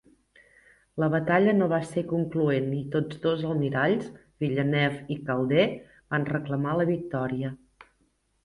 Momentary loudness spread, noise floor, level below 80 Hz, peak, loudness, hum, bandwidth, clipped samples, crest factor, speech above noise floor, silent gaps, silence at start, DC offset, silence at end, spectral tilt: 10 LU; -70 dBFS; -60 dBFS; -8 dBFS; -27 LUFS; none; 11.5 kHz; under 0.1%; 18 dB; 44 dB; none; 0.95 s; under 0.1%; 0.9 s; -8 dB/octave